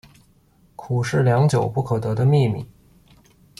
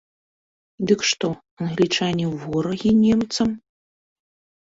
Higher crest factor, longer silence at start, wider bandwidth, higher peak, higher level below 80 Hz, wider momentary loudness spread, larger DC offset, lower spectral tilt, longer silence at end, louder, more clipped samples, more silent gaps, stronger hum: about the same, 14 dB vs 18 dB; about the same, 0.8 s vs 0.8 s; first, 12 kHz vs 8 kHz; second, -8 dBFS vs -4 dBFS; about the same, -52 dBFS vs -54 dBFS; about the same, 13 LU vs 11 LU; neither; first, -7.5 dB/octave vs -5 dB/octave; second, 0.95 s vs 1.1 s; about the same, -20 LUFS vs -21 LUFS; neither; second, none vs 1.51-1.57 s; neither